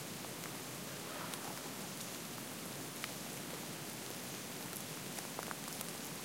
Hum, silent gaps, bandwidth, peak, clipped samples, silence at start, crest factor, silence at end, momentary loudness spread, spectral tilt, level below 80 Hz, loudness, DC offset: none; none; 17 kHz; -20 dBFS; under 0.1%; 0 s; 24 dB; 0 s; 2 LU; -2.5 dB/octave; -76 dBFS; -44 LUFS; under 0.1%